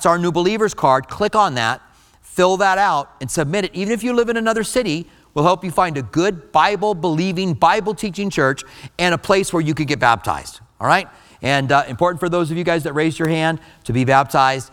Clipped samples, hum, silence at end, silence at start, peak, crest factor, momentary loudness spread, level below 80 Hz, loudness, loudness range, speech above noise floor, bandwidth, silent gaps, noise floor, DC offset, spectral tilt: under 0.1%; none; 0.05 s; 0 s; 0 dBFS; 18 dB; 8 LU; -48 dBFS; -18 LUFS; 1 LU; 27 dB; 18 kHz; none; -45 dBFS; under 0.1%; -5 dB/octave